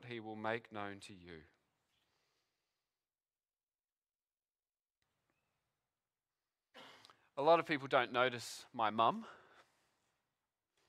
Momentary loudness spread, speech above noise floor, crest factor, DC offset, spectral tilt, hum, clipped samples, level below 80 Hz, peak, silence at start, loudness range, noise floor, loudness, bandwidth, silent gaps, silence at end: 24 LU; over 53 dB; 26 dB; under 0.1%; -4.5 dB/octave; none; under 0.1%; -86 dBFS; -16 dBFS; 0 s; 14 LU; under -90 dBFS; -37 LUFS; 14.5 kHz; 3.63-3.67 s, 3.92-3.96 s; 1.55 s